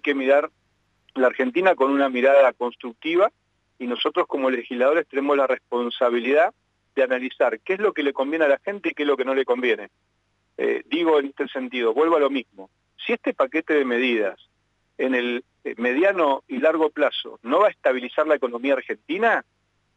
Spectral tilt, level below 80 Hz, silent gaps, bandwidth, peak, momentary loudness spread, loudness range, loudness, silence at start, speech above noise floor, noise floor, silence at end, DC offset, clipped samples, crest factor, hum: -5 dB/octave; -76 dBFS; none; 8 kHz; -6 dBFS; 9 LU; 3 LU; -22 LUFS; 0.05 s; 48 dB; -70 dBFS; 0.55 s; under 0.1%; under 0.1%; 16 dB; 50 Hz at -75 dBFS